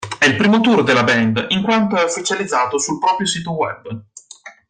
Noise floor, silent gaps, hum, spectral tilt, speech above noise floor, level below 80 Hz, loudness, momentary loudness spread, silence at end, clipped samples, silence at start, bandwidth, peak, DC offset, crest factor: -41 dBFS; none; none; -4 dB/octave; 25 dB; -56 dBFS; -16 LUFS; 10 LU; 0.2 s; under 0.1%; 0 s; 9.6 kHz; -2 dBFS; under 0.1%; 14 dB